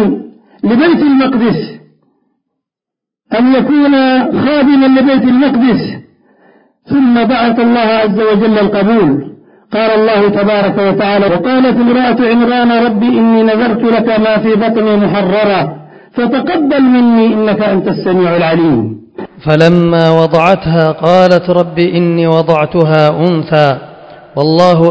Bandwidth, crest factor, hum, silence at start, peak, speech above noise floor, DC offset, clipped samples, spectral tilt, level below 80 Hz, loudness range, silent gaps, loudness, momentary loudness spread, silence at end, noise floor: 8 kHz; 10 dB; none; 0 s; 0 dBFS; 73 dB; 0.2%; 0.5%; -8 dB/octave; -44 dBFS; 2 LU; none; -9 LUFS; 7 LU; 0 s; -82 dBFS